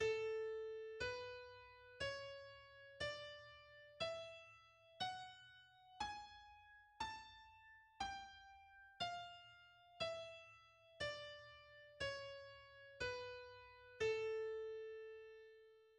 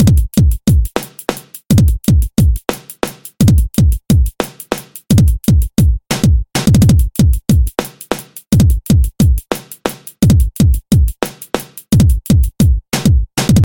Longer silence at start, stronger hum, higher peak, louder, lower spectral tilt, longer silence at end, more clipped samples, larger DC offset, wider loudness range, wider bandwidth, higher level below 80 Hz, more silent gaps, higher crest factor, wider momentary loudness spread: about the same, 0 s vs 0 s; neither; second, -32 dBFS vs 0 dBFS; second, -49 LUFS vs -14 LUFS; second, -3 dB/octave vs -6.5 dB/octave; about the same, 0 s vs 0 s; neither; neither; about the same, 4 LU vs 2 LU; second, 10 kHz vs 17 kHz; second, -74 dBFS vs -16 dBFS; neither; first, 20 dB vs 12 dB; first, 18 LU vs 12 LU